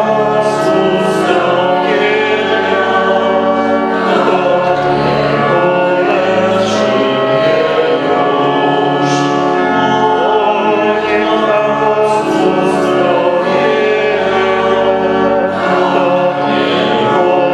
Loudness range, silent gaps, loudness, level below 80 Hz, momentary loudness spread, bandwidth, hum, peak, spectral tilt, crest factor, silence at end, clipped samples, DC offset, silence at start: 0 LU; none; -12 LUFS; -48 dBFS; 1 LU; 11.5 kHz; none; 0 dBFS; -5.5 dB/octave; 12 dB; 0 s; under 0.1%; under 0.1%; 0 s